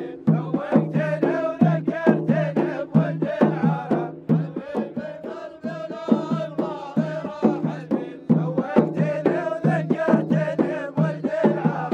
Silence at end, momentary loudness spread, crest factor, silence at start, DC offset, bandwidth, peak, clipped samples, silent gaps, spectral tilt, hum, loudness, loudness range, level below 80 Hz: 0 s; 8 LU; 20 dB; 0 s; under 0.1%; 7.2 kHz; -2 dBFS; under 0.1%; none; -9.5 dB/octave; none; -23 LUFS; 5 LU; -66 dBFS